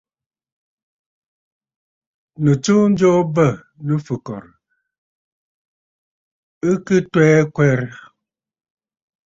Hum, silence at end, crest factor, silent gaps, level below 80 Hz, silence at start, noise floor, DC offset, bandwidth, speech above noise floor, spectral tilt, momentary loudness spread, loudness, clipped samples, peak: none; 1.3 s; 18 dB; 4.98-6.61 s; -56 dBFS; 2.4 s; -81 dBFS; under 0.1%; 7.8 kHz; 66 dB; -7 dB/octave; 14 LU; -17 LUFS; under 0.1%; -2 dBFS